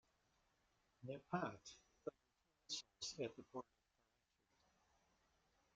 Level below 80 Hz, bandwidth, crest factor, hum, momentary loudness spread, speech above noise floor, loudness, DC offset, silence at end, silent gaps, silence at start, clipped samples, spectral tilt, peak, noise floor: -86 dBFS; 8 kHz; 26 dB; none; 13 LU; 36 dB; -51 LUFS; under 0.1%; 2.15 s; none; 1 s; under 0.1%; -3.5 dB/octave; -30 dBFS; -85 dBFS